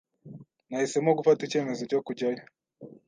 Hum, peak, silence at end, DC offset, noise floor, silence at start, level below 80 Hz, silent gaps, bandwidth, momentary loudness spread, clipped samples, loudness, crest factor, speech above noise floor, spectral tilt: none; -10 dBFS; 0.15 s; under 0.1%; -50 dBFS; 0.25 s; -78 dBFS; none; 9.6 kHz; 15 LU; under 0.1%; -27 LUFS; 20 dB; 23 dB; -5.5 dB/octave